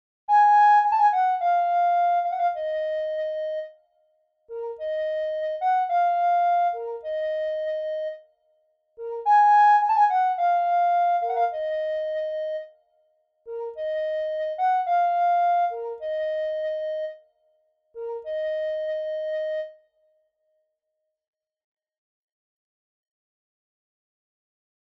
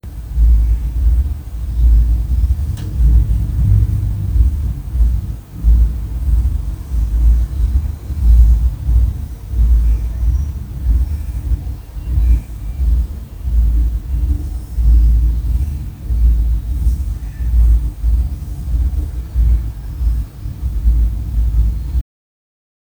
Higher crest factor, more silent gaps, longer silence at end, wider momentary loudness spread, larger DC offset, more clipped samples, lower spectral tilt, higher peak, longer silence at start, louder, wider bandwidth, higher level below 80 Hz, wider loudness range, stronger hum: about the same, 14 dB vs 14 dB; neither; first, 5.25 s vs 1 s; first, 16 LU vs 9 LU; neither; neither; second, -1 dB/octave vs -8 dB/octave; second, -10 dBFS vs 0 dBFS; first, 0.3 s vs 0.05 s; second, -23 LUFS vs -18 LUFS; first, 6.6 kHz vs 1.9 kHz; second, -70 dBFS vs -14 dBFS; first, 11 LU vs 3 LU; neither